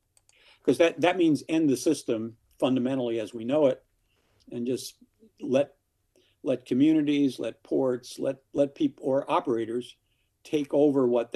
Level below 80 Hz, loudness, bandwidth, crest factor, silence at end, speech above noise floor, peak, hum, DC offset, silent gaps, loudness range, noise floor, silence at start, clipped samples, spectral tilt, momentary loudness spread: -72 dBFS; -27 LUFS; 13 kHz; 20 dB; 0.1 s; 44 dB; -8 dBFS; none; under 0.1%; none; 4 LU; -69 dBFS; 0.65 s; under 0.1%; -6 dB/octave; 12 LU